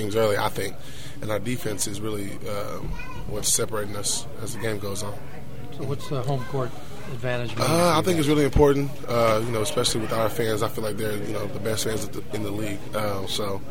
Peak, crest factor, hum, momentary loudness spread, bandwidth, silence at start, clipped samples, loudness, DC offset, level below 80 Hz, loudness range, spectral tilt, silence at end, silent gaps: -4 dBFS; 20 dB; none; 14 LU; 16.5 kHz; 0 s; under 0.1%; -26 LUFS; 4%; -42 dBFS; 8 LU; -4.5 dB/octave; 0 s; none